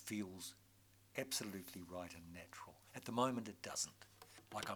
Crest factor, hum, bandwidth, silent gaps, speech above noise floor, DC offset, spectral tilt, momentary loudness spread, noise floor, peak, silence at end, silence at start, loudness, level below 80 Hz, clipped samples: 22 dB; none; over 20 kHz; none; 24 dB; under 0.1%; -3 dB/octave; 17 LU; -70 dBFS; -24 dBFS; 0 s; 0 s; -46 LUFS; -78 dBFS; under 0.1%